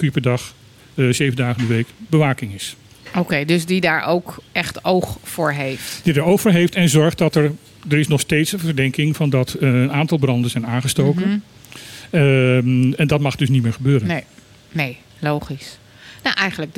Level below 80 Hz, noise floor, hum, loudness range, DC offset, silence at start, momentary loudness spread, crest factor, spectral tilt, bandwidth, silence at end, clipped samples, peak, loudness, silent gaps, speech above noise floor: -50 dBFS; -38 dBFS; none; 3 LU; under 0.1%; 0 s; 11 LU; 16 dB; -6 dB/octave; 17 kHz; 0.05 s; under 0.1%; -2 dBFS; -18 LUFS; none; 20 dB